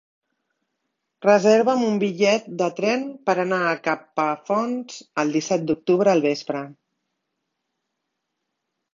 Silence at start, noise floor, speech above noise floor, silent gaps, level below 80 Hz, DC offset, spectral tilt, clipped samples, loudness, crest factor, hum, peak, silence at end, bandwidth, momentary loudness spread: 1.2 s; -79 dBFS; 58 dB; none; -68 dBFS; under 0.1%; -5 dB/octave; under 0.1%; -21 LUFS; 20 dB; none; -2 dBFS; 2.25 s; 7.6 kHz; 10 LU